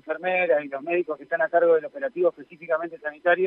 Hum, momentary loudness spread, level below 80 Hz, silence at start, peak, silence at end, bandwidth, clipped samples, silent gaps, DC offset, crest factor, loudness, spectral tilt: none; 8 LU; -80 dBFS; 0.05 s; -8 dBFS; 0 s; 4 kHz; under 0.1%; none; under 0.1%; 16 dB; -24 LUFS; -8 dB/octave